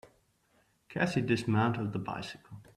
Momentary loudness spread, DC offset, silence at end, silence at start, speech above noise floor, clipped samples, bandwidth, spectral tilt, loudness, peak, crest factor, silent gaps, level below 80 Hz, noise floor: 14 LU; under 0.1%; 0.15 s; 0.05 s; 39 dB; under 0.1%; 12.5 kHz; -6.5 dB/octave; -32 LUFS; -14 dBFS; 20 dB; none; -66 dBFS; -71 dBFS